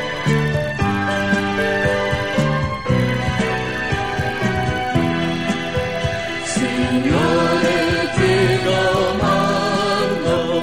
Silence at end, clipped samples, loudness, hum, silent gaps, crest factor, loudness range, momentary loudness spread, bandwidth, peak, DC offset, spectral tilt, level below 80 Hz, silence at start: 0 s; under 0.1%; -18 LUFS; none; none; 14 dB; 4 LU; 5 LU; 16 kHz; -4 dBFS; 0.9%; -5.5 dB/octave; -38 dBFS; 0 s